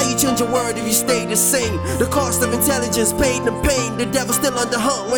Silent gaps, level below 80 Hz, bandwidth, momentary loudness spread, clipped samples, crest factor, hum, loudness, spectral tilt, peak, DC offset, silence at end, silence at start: none; -36 dBFS; over 20 kHz; 4 LU; under 0.1%; 16 dB; none; -17 LUFS; -3.5 dB/octave; -2 dBFS; under 0.1%; 0 s; 0 s